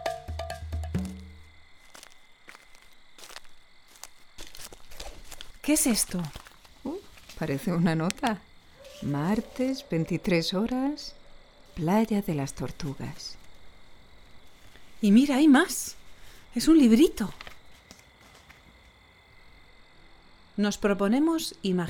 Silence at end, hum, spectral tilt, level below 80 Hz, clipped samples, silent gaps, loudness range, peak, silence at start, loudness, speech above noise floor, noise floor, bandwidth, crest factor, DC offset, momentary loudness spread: 0 s; none; -5 dB/octave; -50 dBFS; under 0.1%; none; 19 LU; -6 dBFS; 0 s; -26 LUFS; 31 dB; -56 dBFS; 19.5 kHz; 24 dB; under 0.1%; 25 LU